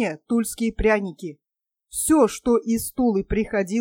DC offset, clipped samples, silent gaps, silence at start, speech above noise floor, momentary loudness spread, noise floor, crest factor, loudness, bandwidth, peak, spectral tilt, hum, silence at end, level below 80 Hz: under 0.1%; under 0.1%; none; 0 s; 60 dB; 13 LU; -82 dBFS; 16 dB; -22 LUFS; 17.5 kHz; -6 dBFS; -5 dB/octave; none; 0 s; -40 dBFS